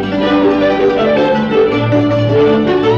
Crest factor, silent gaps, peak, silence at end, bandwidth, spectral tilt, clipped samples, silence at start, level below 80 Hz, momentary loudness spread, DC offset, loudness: 10 dB; none; -2 dBFS; 0 s; 7 kHz; -8 dB/octave; under 0.1%; 0 s; -40 dBFS; 2 LU; under 0.1%; -12 LUFS